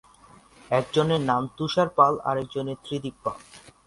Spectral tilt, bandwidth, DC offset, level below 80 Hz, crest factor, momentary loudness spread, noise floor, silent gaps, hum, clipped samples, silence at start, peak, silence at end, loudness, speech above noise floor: -6 dB/octave; 11.5 kHz; under 0.1%; -60 dBFS; 22 dB; 12 LU; -53 dBFS; none; none; under 0.1%; 0.7 s; -4 dBFS; 0.3 s; -25 LUFS; 29 dB